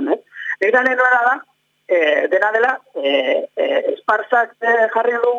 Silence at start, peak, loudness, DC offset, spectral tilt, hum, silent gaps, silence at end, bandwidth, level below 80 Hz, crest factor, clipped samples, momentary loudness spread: 0 s; -2 dBFS; -17 LUFS; under 0.1%; -3.5 dB/octave; none; none; 0 s; 7.6 kHz; -72 dBFS; 14 dB; under 0.1%; 7 LU